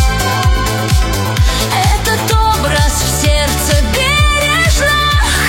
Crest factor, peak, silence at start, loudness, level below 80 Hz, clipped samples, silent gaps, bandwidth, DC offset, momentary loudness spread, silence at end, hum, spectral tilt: 12 dB; 0 dBFS; 0 s; -12 LUFS; -16 dBFS; under 0.1%; none; 16.5 kHz; under 0.1%; 3 LU; 0 s; none; -3.5 dB/octave